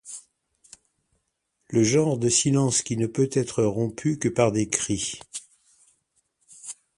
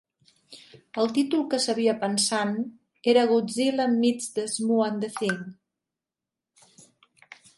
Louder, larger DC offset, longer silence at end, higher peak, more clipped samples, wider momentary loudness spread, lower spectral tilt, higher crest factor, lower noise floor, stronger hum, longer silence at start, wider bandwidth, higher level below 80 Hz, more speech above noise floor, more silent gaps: about the same, -23 LUFS vs -25 LUFS; neither; second, 0.25 s vs 2.05 s; first, -2 dBFS vs -8 dBFS; neither; first, 18 LU vs 8 LU; about the same, -4.5 dB/octave vs -3.5 dB/octave; first, 24 dB vs 18 dB; second, -76 dBFS vs -89 dBFS; neither; second, 0.05 s vs 0.5 s; about the same, 11.5 kHz vs 11.5 kHz; first, -58 dBFS vs -76 dBFS; second, 53 dB vs 64 dB; neither